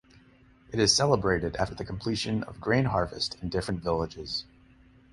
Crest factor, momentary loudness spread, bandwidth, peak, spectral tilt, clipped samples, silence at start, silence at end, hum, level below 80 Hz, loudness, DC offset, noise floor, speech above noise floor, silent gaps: 20 dB; 11 LU; 11.5 kHz; -8 dBFS; -4 dB/octave; under 0.1%; 0.7 s; 0.7 s; none; -48 dBFS; -28 LUFS; under 0.1%; -58 dBFS; 30 dB; none